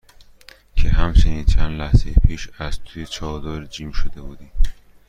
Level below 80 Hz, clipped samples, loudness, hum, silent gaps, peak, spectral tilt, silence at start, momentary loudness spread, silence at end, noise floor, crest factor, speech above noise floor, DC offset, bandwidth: -20 dBFS; under 0.1%; -23 LUFS; none; none; -2 dBFS; -6 dB/octave; 0.75 s; 14 LU; 0.35 s; -47 dBFS; 16 dB; 29 dB; under 0.1%; 7.8 kHz